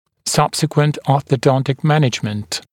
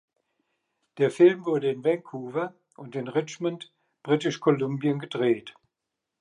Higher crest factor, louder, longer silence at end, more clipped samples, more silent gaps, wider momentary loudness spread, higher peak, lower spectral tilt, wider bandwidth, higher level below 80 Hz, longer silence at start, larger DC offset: about the same, 16 dB vs 20 dB; first, -17 LUFS vs -26 LUFS; second, 0.1 s vs 0.7 s; neither; neither; second, 6 LU vs 16 LU; first, 0 dBFS vs -8 dBFS; about the same, -5.5 dB/octave vs -6.5 dB/octave; first, 16.5 kHz vs 10.5 kHz; first, -54 dBFS vs -80 dBFS; second, 0.25 s vs 0.95 s; neither